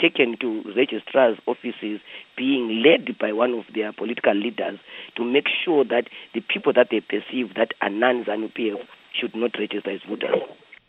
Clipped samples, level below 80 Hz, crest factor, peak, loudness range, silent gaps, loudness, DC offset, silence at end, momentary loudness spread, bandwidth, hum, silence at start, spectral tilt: under 0.1%; -78 dBFS; 20 dB; -2 dBFS; 3 LU; none; -23 LUFS; under 0.1%; 0.35 s; 11 LU; 4.6 kHz; none; 0 s; -7 dB/octave